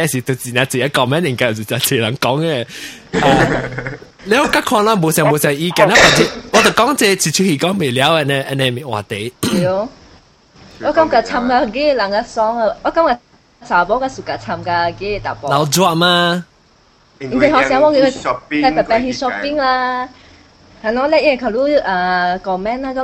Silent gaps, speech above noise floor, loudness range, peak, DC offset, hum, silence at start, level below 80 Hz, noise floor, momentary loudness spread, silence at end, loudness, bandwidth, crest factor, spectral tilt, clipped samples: none; 36 dB; 5 LU; 0 dBFS; under 0.1%; none; 0 s; -42 dBFS; -51 dBFS; 10 LU; 0 s; -14 LUFS; 16.5 kHz; 16 dB; -4 dB/octave; under 0.1%